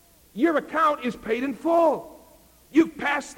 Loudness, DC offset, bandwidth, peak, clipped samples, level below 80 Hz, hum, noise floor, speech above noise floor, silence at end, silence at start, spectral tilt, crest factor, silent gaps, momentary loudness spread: -24 LUFS; under 0.1%; 16.5 kHz; -8 dBFS; under 0.1%; -60 dBFS; none; -54 dBFS; 31 dB; 0.05 s; 0.35 s; -5 dB/octave; 16 dB; none; 8 LU